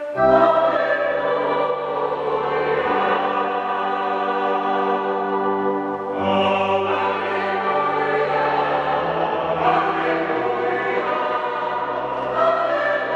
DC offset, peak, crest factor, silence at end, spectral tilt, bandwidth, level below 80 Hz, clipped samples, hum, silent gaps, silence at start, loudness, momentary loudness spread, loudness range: under 0.1%; -4 dBFS; 16 dB; 0 s; -6.5 dB/octave; 8.4 kHz; -56 dBFS; under 0.1%; none; none; 0 s; -20 LUFS; 4 LU; 1 LU